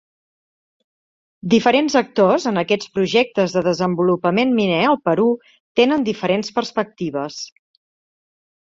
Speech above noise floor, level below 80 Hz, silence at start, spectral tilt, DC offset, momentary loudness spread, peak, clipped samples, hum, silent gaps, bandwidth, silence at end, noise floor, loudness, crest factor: over 72 dB; -60 dBFS; 1.45 s; -5.5 dB/octave; under 0.1%; 9 LU; -2 dBFS; under 0.1%; none; 5.60-5.75 s; 7.8 kHz; 1.25 s; under -90 dBFS; -18 LUFS; 18 dB